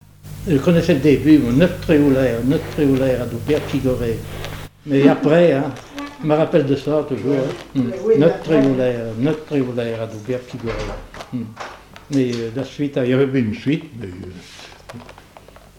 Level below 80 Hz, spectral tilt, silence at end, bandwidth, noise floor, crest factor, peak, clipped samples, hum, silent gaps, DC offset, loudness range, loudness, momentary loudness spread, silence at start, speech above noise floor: -40 dBFS; -7.5 dB/octave; 0.65 s; 19.5 kHz; -44 dBFS; 18 dB; 0 dBFS; under 0.1%; none; none; under 0.1%; 8 LU; -18 LUFS; 18 LU; 0.25 s; 26 dB